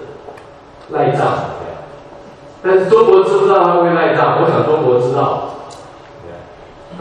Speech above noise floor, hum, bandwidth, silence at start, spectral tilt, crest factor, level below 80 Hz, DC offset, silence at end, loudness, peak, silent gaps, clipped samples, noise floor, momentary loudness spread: 26 dB; none; 9.4 kHz; 0 s; -7.5 dB/octave; 14 dB; -52 dBFS; under 0.1%; 0 s; -13 LUFS; 0 dBFS; none; under 0.1%; -38 dBFS; 24 LU